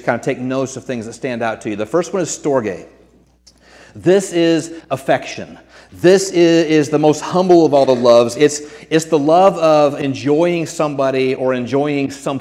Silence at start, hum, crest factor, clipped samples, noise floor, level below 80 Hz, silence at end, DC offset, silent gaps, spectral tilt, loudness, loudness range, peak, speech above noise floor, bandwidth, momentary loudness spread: 0.05 s; none; 14 dB; under 0.1%; -50 dBFS; -56 dBFS; 0 s; under 0.1%; none; -5.5 dB/octave; -15 LUFS; 8 LU; 0 dBFS; 36 dB; 14 kHz; 12 LU